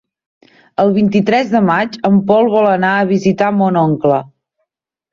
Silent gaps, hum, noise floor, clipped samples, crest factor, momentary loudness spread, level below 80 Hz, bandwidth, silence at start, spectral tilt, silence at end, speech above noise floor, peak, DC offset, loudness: none; none; -76 dBFS; under 0.1%; 12 dB; 4 LU; -54 dBFS; 7.2 kHz; 0.8 s; -7.5 dB/octave; 0.85 s; 63 dB; 0 dBFS; under 0.1%; -13 LUFS